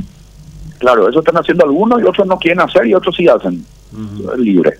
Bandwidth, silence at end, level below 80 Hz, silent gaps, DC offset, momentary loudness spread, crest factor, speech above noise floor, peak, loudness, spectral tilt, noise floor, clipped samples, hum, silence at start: 11 kHz; 0.05 s; -42 dBFS; none; under 0.1%; 15 LU; 12 dB; 25 dB; 0 dBFS; -11 LUFS; -7 dB/octave; -36 dBFS; under 0.1%; none; 0 s